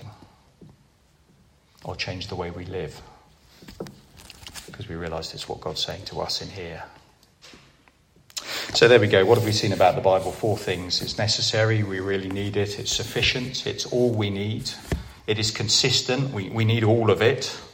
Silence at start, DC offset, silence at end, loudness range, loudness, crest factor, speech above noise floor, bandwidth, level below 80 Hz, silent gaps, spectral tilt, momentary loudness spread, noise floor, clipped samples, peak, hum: 0 s; under 0.1%; 0.05 s; 15 LU; -23 LUFS; 24 dB; 36 dB; 16.5 kHz; -50 dBFS; none; -4 dB/octave; 19 LU; -59 dBFS; under 0.1%; -2 dBFS; none